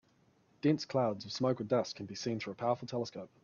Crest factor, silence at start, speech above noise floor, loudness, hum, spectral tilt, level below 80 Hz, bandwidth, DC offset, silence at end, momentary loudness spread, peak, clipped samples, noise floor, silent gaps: 18 dB; 0.65 s; 35 dB; -35 LUFS; none; -6 dB/octave; -76 dBFS; 7.2 kHz; under 0.1%; 0.15 s; 8 LU; -18 dBFS; under 0.1%; -70 dBFS; none